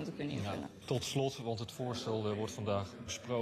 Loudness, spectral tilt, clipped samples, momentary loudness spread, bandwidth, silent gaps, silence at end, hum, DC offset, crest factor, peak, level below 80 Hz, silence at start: -38 LUFS; -5 dB/octave; under 0.1%; 5 LU; 13.5 kHz; none; 0 s; none; under 0.1%; 16 dB; -22 dBFS; -66 dBFS; 0 s